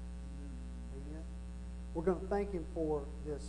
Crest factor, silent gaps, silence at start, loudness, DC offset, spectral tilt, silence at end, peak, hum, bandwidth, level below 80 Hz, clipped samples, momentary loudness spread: 18 dB; none; 0 s; -41 LUFS; under 0.1%; -8 dB/octave; 0 s; -20 dBFS; 60 Hz at -45 dBFS; 11 kHz; -46 dBFS; under 0.1%; 11 LU